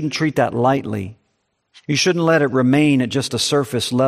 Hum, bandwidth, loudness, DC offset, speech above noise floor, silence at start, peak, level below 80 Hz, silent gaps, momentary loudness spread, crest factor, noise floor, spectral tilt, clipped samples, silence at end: none; 15 kHz; -17 LUFS; under 0.1%; 52 dB; 0 s; -2 dBFS; -58 dBFS; none; 11 LU; 16 dB; -69 dBFS; -5 dB/octave; under 0.1%; 0 s